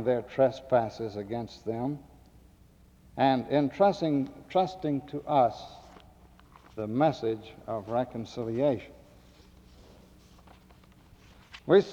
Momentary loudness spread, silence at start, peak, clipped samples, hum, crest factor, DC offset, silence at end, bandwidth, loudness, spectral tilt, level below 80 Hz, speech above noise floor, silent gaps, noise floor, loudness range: 18 LU; 0 s; -10 dBFS; under 0.1%; none; 20 dB; under 0.1%; 0 s; 10.5 kHz; -29 LUFS; -7.5 dB/octave; -60 dBFS; 29 dB; none; -58 dBFS; 7 LU